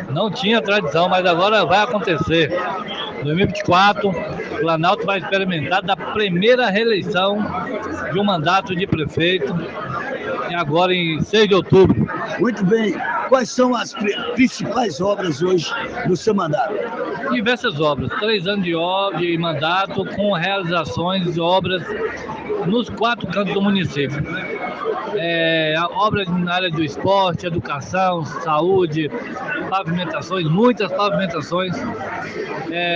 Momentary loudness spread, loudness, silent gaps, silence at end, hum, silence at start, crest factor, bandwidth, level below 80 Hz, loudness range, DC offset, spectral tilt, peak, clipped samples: 9 LU; -19 LUFS; none; 0 s; none; 0 s; 18 dB; 7.8 kHz; -50 dBFS; 3 LU; under 0.1%; -5.5 dB/octave; 0 dBFS; under 0.1%